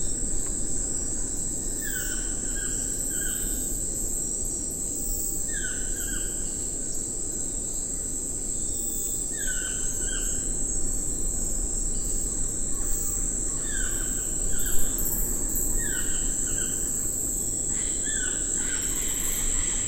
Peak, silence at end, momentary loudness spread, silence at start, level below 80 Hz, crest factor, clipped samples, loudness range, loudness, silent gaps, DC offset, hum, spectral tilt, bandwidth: -8 dBFS; 0 s; 3 LU; 0 s; -34 dBFS; 18 dB; under 0.1%; 3 LU; -26 LUFS; none; under 0.1%; none; -2 dB/octave; 17 kHz